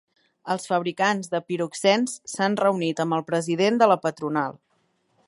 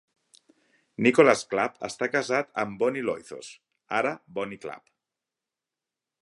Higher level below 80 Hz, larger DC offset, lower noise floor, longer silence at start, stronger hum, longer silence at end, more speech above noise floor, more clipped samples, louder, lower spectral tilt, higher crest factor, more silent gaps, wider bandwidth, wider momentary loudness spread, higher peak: about the same, -76 dBFS vs -72 dBFS; neither; second, -69 dBFS vs -89 dBFS; second, 0.45 s vs 1 s; neither; second, 0.7 s vs 1.45 s; second, 46 dB vs 63 dB; neither; about the same, -24 LUFS vs -26 LUFS; about the same, -4.5 dB/octave vs -4.5 dB/octave; about the same, 20 dB vs 24 dB; neither; about the same, 11.5 kHz vs 11.5 kHz; second, 9 LU vs 22 LU; about the same, -4 dBFS vs -4 dBFS